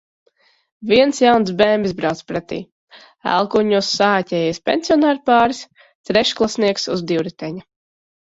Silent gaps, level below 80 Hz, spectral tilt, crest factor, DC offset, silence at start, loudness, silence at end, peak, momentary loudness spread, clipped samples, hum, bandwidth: 2.72-2.88 s, 5.95-6.04 s; -54 dBFS; -4.5 dB/octave; 18 dB; under 0.1%; 0.8 s; -17 LUFS; 0.75 s; 0 dBFS; 14 LU; under 0.1%; none; 8 kHz